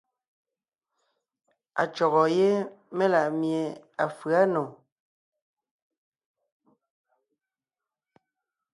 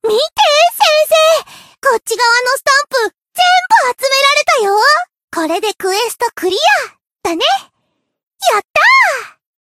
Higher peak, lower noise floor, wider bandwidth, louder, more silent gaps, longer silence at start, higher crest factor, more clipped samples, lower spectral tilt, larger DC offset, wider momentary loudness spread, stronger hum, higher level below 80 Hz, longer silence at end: second, -10 dBFS vs 0 dBFS; first, under -90 dBFS vs -67 dBFS; second, 11.5 kHz vs 16 kHz; second, -26 LUFS vs -11 LUFS; second, none vs 5.23-5.28 s, 8.27-8.31 s, 8.70-8.74 s; first, 1.75 s vs 0.05 s; first, 20 dB vs 12 dB; neither; first, -6.5 dB/octave vs 0 dB/octave; neither; first, 11 LU vs 8 LU; neither; second, -78 dBFS vs -60 dBFS; first, 4 s vs 0.35 s